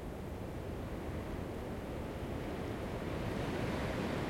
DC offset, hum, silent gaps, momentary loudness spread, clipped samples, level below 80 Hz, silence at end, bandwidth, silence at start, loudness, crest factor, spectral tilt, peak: under 0.1%; none; none; 6 LU; under 0.1%; -50 dBFS; 0 s; 16.5 kHz; 0 s; -41 LUFS; 16 dB; -6.5 dB/octave; -24 dBFS